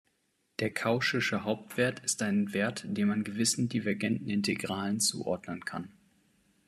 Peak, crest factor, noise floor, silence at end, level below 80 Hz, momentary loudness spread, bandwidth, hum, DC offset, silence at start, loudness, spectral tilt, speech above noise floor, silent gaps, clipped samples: -14 dBFS; 18 dB; -75 dBFS; 0.75 s; -72 dBFS; 8 LU; 14 kHz; none; under 0.1%; 0.6 s; -31 LUFS; -4 dB/octave; 44 dB; none; under 0.1%